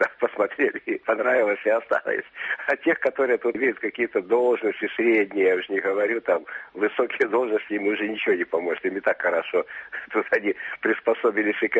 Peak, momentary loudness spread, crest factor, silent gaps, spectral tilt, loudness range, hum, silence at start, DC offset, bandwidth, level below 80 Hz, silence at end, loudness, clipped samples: -8 dBFS; 6 LU; 16 dB; none; -2 dB/octave; 2 LU; none; 0 s; under 0.1%; 8 kHz; -72 dBFS; 0 s; -24 LUFS; under 0.1%